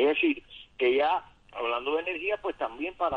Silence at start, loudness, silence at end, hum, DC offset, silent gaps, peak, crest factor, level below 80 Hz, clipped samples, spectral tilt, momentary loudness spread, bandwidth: 0 s; -29 LUFS; 0 s; none; under 0.1%; none; -14 dBFS; 14 dB; -60 dBFS; under 0.1%; -6 dB/octave; 10 LU; 5.4 kHz